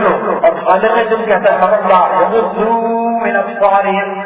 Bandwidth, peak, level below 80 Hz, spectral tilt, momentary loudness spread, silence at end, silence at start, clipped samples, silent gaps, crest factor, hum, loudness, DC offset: 4 kHz; 0 dBFS; -54 dBFS; -9 dB/octave; 4 LU; 0 s; 0 s; 0.1%; none; 12 dB; none; -12 LUFS; under 0.1%